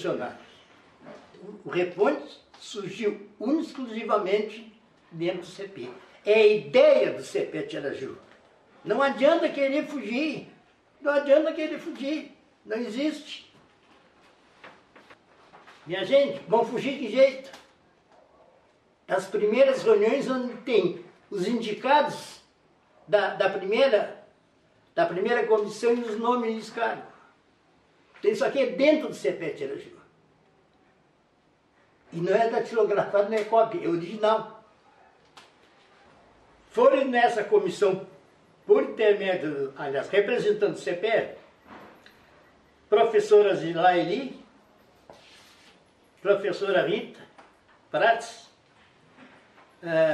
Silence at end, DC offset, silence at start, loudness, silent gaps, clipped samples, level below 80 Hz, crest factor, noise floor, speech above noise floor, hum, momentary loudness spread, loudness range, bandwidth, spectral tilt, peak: 0 s; under 0.1%; 0 s; -25 LUFS; none; under 0.1%; -76 dBFS; 20 dB; -64 dBFS; 40 dB; none; 17 LU; 6 LU; 11.5 kHz; -5 dB/octave; -6 dBFS